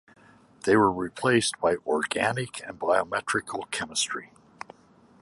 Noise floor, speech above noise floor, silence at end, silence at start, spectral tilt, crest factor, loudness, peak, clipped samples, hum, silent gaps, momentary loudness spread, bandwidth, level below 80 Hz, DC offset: -57 dBFS; 31 dB; 0.95 s; 0.65 s; -3.5 dB/octave; 20 dB; -26 LUFS; -8 dBFS; under 0.1%; none; none; 14 LU; 11.5 kHz; -60 dBFS; under 0.1%